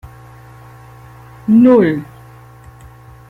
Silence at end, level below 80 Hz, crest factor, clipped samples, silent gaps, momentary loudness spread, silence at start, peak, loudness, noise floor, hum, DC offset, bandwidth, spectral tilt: 1.25 s; -48 dBFS; 14 dB; under 0.1%; none; 19 LU; 0.05 s; -2 dBFS; -12 LUFS; -39 dBFS; none; under 0.1%; 4.3 kHz; -9 dB/octave